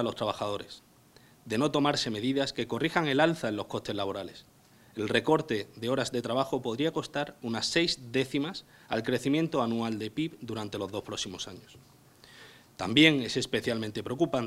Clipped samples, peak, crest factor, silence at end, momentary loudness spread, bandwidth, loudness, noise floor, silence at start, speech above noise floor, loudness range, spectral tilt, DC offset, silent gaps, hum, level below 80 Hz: under 0.1%; -4 dBFS; 26 dB; 0 s; 11 LU; 16 kHz; -30 LUFS; -59 dBFS; 0 s; 29 dB; 3 LU; -4.5 dB/octave; under 0.1%; none; none; -62 dBFS